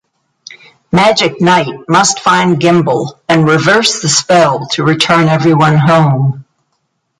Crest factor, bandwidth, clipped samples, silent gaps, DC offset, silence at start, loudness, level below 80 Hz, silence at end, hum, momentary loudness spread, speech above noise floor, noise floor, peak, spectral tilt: 10 dB; 11.5 kHz; under 0.1%; none; under 0.1%; 0.9 s; -10 LUFS; -48 dBFS; 0.75 s; none; 5 LU; 55 dB; -65 dBFS; 0 dBFS; -4.5 dB/octave